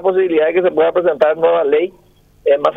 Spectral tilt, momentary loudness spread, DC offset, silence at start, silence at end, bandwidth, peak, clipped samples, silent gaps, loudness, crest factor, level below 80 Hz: -7 dB/octave; 4 LU; under 0.1%; 0 s; 0 s; 5.6 kHz; 0 dBFS; under 0.1%; none; -15 LUFS; 14 dB; -56 dBFS